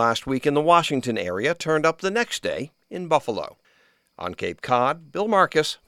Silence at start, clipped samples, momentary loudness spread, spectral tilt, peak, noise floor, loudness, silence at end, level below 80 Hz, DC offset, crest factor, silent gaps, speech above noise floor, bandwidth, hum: 0 s; under 0.1%; 14 LU; -4.5 dB/octave; -2 dBFS; -62 dBFS; -23 LUFS; 0.15 s; -58 dBFS; under 0.1%; 22 dB; none; 39 dB; 15.5 kHz; none